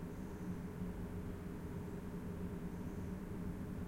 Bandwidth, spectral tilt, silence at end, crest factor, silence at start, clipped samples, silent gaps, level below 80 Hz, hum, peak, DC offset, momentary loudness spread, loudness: 16.5 kHz; -8 dB/octave; 0 s; 12 dB; 0 s; under 0.1%; none; -54 dBFS; none; -32 dBFS; under 0.1%; 2 LU; -46 LUFS